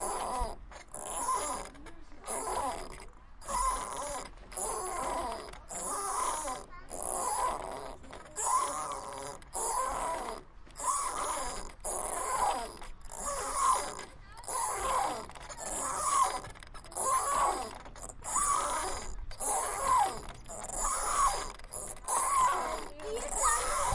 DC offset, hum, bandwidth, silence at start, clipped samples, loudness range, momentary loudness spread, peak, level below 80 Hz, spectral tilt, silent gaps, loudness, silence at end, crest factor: under 0.1%; none; 11.5 kHz; 0 s; under 0.1%; 5 LU; 16 LU; -16 dBFS; -48 dBFS; -1.5 dB/octave; none; -33 LUFS; 0 s; 18 dB